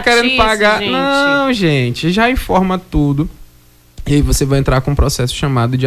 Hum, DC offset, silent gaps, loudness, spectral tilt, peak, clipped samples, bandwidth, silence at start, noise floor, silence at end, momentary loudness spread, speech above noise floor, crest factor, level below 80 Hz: none; under 0.1%; none; -13 LUFS; -5 dB/octave; 0 dBFS; under 0.1%; 15.5 kHz; 0 s; -46 dBFS; 0 s; 6 LU; 33 dB; 12 dB; -24 dBFS